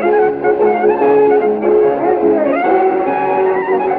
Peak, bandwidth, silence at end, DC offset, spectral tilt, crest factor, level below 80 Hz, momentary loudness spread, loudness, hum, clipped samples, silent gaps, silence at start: -2 dBFS; 4.3 kHz; 0 s; under 0.1%; -10 dB/octave; 10 dB; -52 dBFS; 3 LU; -13 LUFS; none; under 0.1%; none; 0 s